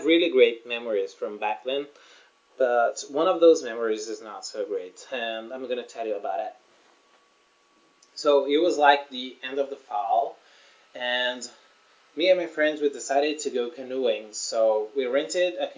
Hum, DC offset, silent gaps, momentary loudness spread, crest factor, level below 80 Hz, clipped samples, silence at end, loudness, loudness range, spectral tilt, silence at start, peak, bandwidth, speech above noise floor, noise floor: none; under 0.1%; none; 14 LU; 22 dB; under -90 dBFS; under 0.1%; 0.05 s; -25 LUFS; 8 LU; -2 dB/octave; 0 s; -4 dBFS; 7.6 kHz; 38 dB; -63 dBFS